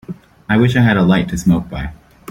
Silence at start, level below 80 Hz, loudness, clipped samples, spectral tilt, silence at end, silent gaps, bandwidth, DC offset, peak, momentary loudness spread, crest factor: 0.1 s; -36 dBFS; -14 LUFS; under 0.1%; -7 dB/octave; 0.35 s; none; 16 kHz; under 0.1%; 0 dBFS; 18 LU; 14 dB